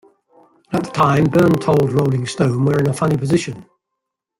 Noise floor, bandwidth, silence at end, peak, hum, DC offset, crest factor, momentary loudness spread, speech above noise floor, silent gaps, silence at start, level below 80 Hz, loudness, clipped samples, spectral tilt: -80 dBFS; 16 kHz; 0.75 s; -2 dBFS; none; under 0.1%; 16 dB; 10 LU; 64 dB; none; 0.7 s; -50 dBFS; -17 LUFS; under 0.1%; -7 dB/octave